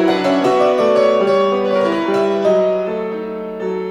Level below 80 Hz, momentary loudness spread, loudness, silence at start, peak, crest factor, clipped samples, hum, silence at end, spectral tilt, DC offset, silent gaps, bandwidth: -56 dBFS; 10 LU; -16 LUFS; 0 s; -2 dBFS; 12 dB; under 0.1%; none; 0 s; -6 dB/octave; under 0.1%; none; 11 kHz